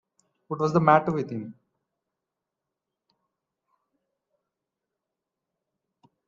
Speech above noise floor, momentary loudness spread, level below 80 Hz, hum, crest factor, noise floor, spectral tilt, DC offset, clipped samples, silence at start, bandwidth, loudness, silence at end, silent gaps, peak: 63 dB; 18 LU; -70 dBFS; none; 26 dB; -86 dBFS; -8 dB/octave; under 0.1%; under 0.1%; 0.5 s; 7.4 kHz; -23 LUFS; 4.75 s; none; -4 dBFS